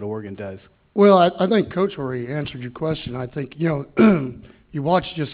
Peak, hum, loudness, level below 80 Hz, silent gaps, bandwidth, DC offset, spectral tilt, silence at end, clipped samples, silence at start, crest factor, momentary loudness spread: -2 dBFS; none; -20 LUFS; -50 dBFS; none; 4 kHz; under 0.1%; -11 dB/octave; 0 s; under 0.1%; 0 s; 18 dB; 16 LU